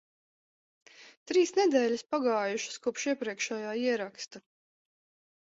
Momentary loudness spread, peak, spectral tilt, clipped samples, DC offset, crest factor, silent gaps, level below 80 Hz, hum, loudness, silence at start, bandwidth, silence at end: 9 LU; -12 dBFS; -3 dB/octave; under 0.1%; under 0.1%; 20 dB; 1.17-1.26 s; -80 dBFS; none; -30 LUFS; 1 s; 8 kHz; 1.2 s